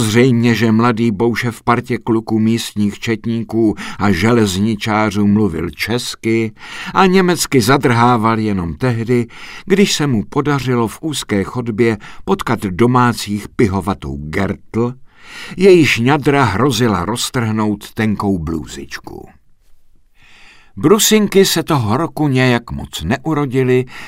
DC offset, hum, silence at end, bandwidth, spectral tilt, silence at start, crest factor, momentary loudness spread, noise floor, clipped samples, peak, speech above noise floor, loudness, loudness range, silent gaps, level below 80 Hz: under 0.1%; none; 0 s; 16 kHz; -5.5 dB/octave; 0 s; 14 dB; 10 LU; -45 dBFS; under 0.1%; 0 dBFS; 30 dB; -15 LUFS; 4 LU; none; -40 dBFS